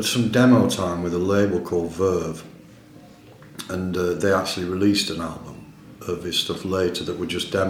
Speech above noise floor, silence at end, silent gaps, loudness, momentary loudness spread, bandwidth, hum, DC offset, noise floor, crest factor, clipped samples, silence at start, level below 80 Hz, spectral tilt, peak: 25 dB; 0 s; none; -22 LUFS; 17 LU; 16.5 kHz; none; under 0.1%; -46 dBFS; 18 dB; under 0.1%; 0 s; -52 dBFS; -5 dB/octave; -4 dBFS